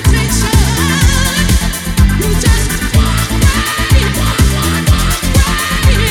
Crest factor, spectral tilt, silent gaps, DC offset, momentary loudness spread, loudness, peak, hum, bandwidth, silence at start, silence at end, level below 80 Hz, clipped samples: 10 dB; -4 dB/octave; none; under 0.1%; 2 LU; -12 LUFS; 0 dBFS; none; 18.5 kHz; 0 s; 0 s; -14 dBFS; under 0.1%